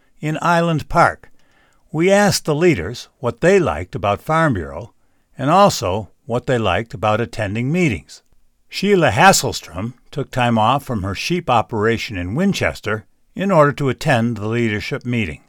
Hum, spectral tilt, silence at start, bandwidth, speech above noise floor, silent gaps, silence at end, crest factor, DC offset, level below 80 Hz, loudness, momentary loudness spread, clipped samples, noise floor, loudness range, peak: none; -5 dB/octave; 0.2 s; over 20 kHz; 37 dB; none; 0.1 s; 18 dB; under 0.1%; -42 dBFS; -17 LUFS; 13 LU; under 0.1%; -54 dBFS; 2 LU; 0 dBFS